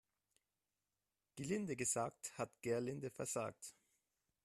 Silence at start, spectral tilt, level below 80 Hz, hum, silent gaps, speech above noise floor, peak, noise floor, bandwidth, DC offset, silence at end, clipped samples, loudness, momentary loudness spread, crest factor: 1.35 s; -4.5 dB/octave; -80 dBFS; 50 Hz at -70 dBFS; none; over 46 dB; -28 dBFS; under -90 dBFS; 14 kHz; under 0.1%; 0.75 s; under 0.1%; -43 LUFS; 13 LU; 18 dB